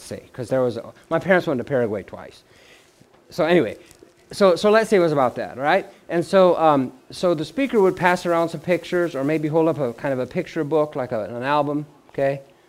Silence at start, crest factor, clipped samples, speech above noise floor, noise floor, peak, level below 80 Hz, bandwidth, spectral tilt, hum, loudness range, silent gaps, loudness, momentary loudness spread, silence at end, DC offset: 0 s; 20 dB; under 0.1%; 33 dB; -53 dBFS; -2 dBFS; -58 dBFS; 15.5 kHz; -6 dB/octave; none; 5 LU; none; -21 LUFS; 12 LU; 0.25 s; under 0.1%